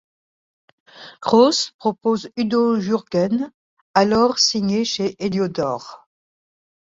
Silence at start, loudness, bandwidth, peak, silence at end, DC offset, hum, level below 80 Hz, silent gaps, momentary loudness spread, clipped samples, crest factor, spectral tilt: 0.95 s; -19 LUFS; 7.8 kHz; 0 dBFS; 0.85 s; under 0.1%; none; -58 dBFS; 1.74-1.79 s, 3.54-3.94 s; 10 LU; under 0.1%; 20 dB; -4.5 dB/octave